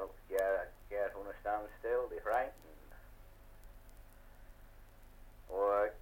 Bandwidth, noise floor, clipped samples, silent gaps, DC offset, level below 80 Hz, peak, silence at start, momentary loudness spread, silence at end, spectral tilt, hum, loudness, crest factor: 16.5 kHz; -57 dBFS; under 0.1%; none; under 0.1%; -56 dBFS; -22 dBFS; 0 s; 25 LU; 0 s; -5 dB/octave; none; -38 LUFS; 18 dB